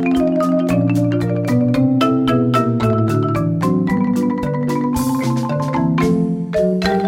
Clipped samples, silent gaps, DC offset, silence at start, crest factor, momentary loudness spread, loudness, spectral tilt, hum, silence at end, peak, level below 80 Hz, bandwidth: under 0.1%; none; under 0.1%; 0 s; 12 dB; 4 LU; -17 LUFS; -7.5 dB/octave; none; 0 s; -4 dBFS; -42 dBFS; 16.5 kHz